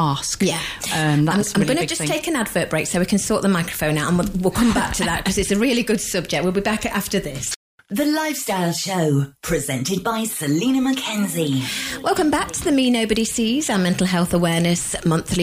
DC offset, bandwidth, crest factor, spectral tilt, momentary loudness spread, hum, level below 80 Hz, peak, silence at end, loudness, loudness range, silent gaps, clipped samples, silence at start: under 0.1%; 15.5 kHz; 14 dB; -4.5 dB/octave; 4 LU; none; -42 dBFS; -6 dBFS; 0 s; -20 LUFS; 3 LU; 7.56-7.78 s; under 0.1%; 0 s